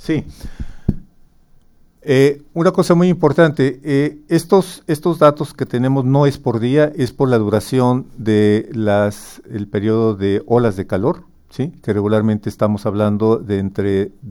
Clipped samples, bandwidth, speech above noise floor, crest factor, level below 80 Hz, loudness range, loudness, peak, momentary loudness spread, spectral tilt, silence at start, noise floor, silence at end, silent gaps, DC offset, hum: under 0.1%; 17.5 kHz; 33 dB; 16 dB; -40 dBFS; 3 LU; -16 LUFS; 0 dBFS; 11 LU; -7.5 dB/octave; 0.05 s; -49 dBFS; 0 s; none; under 0.1%; none